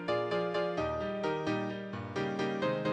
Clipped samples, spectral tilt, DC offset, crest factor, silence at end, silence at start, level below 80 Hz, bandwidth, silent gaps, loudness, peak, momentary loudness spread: under 0.1%; -6.5 dB/octave; under 0.1%; 14 dB; 0 s; 0 s; -60 dBFS; 9.6 kHz; none; -34 LUFS; -20 dBFS; 5 LU